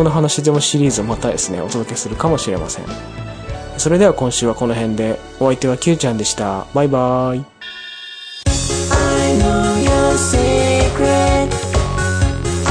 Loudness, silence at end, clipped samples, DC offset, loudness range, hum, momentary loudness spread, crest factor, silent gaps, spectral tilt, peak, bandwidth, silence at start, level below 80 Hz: -16 LUFS; 0 s; under 0.1%; under 0.1%; 4 LU; none; 14 LU; 14 dB; none; -4.5 dB/octave; -2 dBFS; 10.5 kHz; 0 s; -26 dBFS